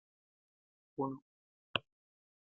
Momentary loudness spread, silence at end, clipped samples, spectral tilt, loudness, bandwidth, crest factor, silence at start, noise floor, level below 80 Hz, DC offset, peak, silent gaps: 11 LU; 0.8 s; under 0.1%; -2.5 dB/octave; -42 LUFS; 6 kHz; 34 dB; 1 s; under -90 dBFS; -80 dBFS; under 0.1%; -12 dBFS; 1.22-1.74 s